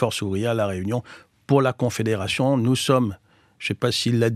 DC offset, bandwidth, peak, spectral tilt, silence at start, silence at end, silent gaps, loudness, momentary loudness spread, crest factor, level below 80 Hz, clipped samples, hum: under 0.1%; 14.5 kHz; -4 dBFS; -5.5 dB/octave; 0 s; 0 s; none; -22 LUFS; 9 LU; 18 dB; -60 dBFS; under 0.1%; none